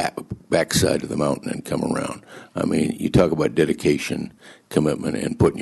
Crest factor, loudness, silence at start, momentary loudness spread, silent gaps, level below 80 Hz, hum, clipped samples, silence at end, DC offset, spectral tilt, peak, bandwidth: 18 dB; -22 LUFS; 0 s; 11 LU; none; -44 dBFS; none; under 0.1%; 0 s; under 0.1%; -5.5 dB/octave; -4 dBFS; 12.5 kHz